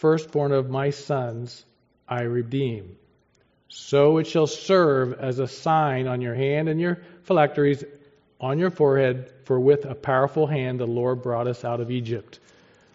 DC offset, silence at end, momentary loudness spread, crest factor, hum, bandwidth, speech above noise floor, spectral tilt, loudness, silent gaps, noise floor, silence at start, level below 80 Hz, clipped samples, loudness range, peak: under 0.1%; 0.6 s; 12 LU; 20 dB; none; 7.8 kHz; 41 dB; -6 dB/octave; -23 LUFS; none; -64 dBFS; 0.05 s; -64 dBFS; under 0.1%; 4 LU; -4 dBFS